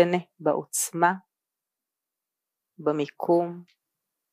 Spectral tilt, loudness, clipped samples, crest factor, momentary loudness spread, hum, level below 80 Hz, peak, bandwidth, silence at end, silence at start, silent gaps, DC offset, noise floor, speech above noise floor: -4.5 dB/octave; -26 LUFS; under 0.1%; 22 dB; 10 LU; none; -86 dBFS; -6 dBFS; 15.5 kHz; 0.7 s; 0 s; none; under 0.1%; -88 dBFS; 62 dB